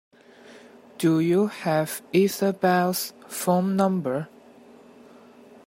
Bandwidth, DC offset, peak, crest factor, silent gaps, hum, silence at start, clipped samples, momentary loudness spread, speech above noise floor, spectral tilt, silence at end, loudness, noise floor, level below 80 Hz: 16 kHz; under 0.1%; -6 dBFS; 18 dB; none; none; 0.5 s; under 0.1%; 8 LU; 27 dB; -5.5 dB/octave; 1.4 s; -24 LUFS; -50 dBFS; -70 dBFS